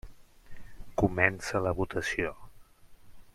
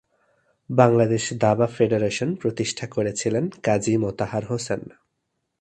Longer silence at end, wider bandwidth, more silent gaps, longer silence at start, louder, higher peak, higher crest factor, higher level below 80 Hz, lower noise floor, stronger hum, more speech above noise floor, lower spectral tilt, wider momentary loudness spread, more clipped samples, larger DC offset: second, 0.1 s vs 0.7 s; first, 15 kHz vs 11 kHz; neither; second, 0.05 s vs 0.7 s; second, -30 LUFS vs -23 LUFS; second, -6 dBFS vs 0 dBFS; about the same, 26 dB vs 22 dB; first, -48 dBFS vs -56 dBFS; second, -53 dBFS vs -77 dBFS; neither; second, 23 dB vs 55 dB; about the same, -5.5 dB/octave vs -5.5 dB/octave; about the same, 9 LU vs 9 LU; neither; neither